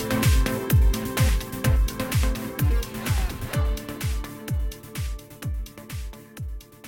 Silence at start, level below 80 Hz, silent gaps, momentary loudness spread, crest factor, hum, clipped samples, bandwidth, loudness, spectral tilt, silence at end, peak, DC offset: 0 s; -26 dBFS; none; 15 LU; 14 dB; none; under 0.1%; 17.5 kHz; -26 LUFS; -5.5 dB/octave; 0 s; -10 dBFS; under 0.1%